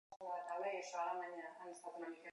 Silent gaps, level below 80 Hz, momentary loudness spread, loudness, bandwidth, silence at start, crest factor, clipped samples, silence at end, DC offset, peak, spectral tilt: 0.16-0.20 s; under -90 dBFS; 9 LU; -46 LUFS; 11 kHz; 0.1 s; 16 dB; under 0.1%; 0 s; under 0.1%; -30 dBFS; -2.5 dB/octave